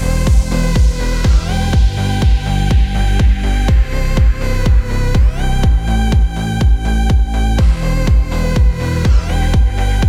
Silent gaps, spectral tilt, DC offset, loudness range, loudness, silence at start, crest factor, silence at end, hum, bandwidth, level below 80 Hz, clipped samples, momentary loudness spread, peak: none; -6 dB/octave; under 0.1%; 0 LU; -15 LUFS; 0 s; 10 dB; 0 s; none; 12.5 kHz; -12 dBFS; under 0.1%; 2 LU; 0 dBFS